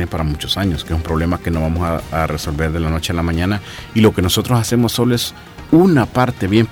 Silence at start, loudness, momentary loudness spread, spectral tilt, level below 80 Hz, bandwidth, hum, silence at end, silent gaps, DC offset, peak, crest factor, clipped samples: 0 s; -17 LUFS; 7 LU; -5.5 dB/octave; -30 dBFS; 18 kHz; none; 0 s; none; under 0.1%; -2 dBFS; 14 dB; under 0.1%